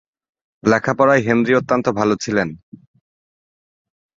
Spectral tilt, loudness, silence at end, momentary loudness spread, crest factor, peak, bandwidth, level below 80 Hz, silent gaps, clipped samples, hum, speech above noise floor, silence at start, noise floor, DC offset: -6 dB/octave; -17 LUFS; 1.6 s; 7 LU; 18 dB; -2 dBFS; 7.8 kHz; -56 dBFS; none; under 0.1%; none; over 73 dB; 0.65 s; under -90 dBFS; under 0.1%